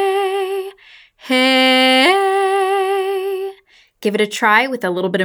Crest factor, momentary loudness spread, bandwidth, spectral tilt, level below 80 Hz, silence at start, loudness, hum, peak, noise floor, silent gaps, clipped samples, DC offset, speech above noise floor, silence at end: 16 dB; 13 LU; over 20 kHz; -3.5 dB/octave; -72 dBFS; 0 s; -15 LUFS; none; 0 dBFS; -49 dBFS; none; under 0.1%; under 0.1%; 33 dB; 0 s